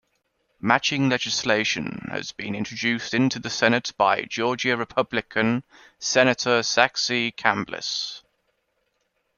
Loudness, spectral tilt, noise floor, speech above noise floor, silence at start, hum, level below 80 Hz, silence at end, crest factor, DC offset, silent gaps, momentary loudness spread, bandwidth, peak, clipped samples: -23 LUFS; -3.5 dB/octave; -72 dBFS; 49 dB; 0.65 s; none; -62 dBFS; 1.2 s; 22 dB; under 0.1%; none; 11 LU; 7.2 kHz; -2 dBFS; under 0.1%